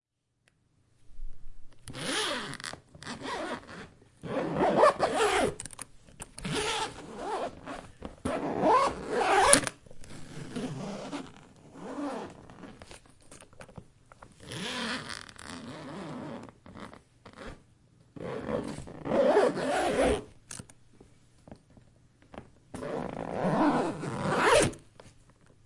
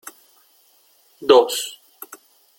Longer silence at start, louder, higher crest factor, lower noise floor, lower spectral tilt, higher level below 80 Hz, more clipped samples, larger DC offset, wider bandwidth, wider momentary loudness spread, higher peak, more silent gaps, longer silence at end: second, 1.05 s vs 1.2 s; second, -29 LUFS vs -18 LUFS; first, 32 dB vs 20 dB; first, -73 dBFS vs -57 dBFS; first, -3.5 dB/octave vs -2 dB/octave; first, -52 dBFS vs -68 dBFS; neither; neither; second, 12 kHz vs 17 kHz; about the same, 25 LU vs 25 LU; about the same, 0 dBFS vs -2 dBFS; neither; second, 0.55 s vs 0.85 s